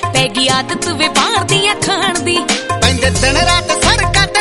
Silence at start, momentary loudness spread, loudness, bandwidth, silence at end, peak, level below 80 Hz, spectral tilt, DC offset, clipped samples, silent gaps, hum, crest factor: 0 s; 3 LU; -12 LUFS; 13 kHz; 0 s; 0 dBFS; -28 dBFS; -3 dB/octave; under 0.1%; under 0.1%; none; none; 14 dB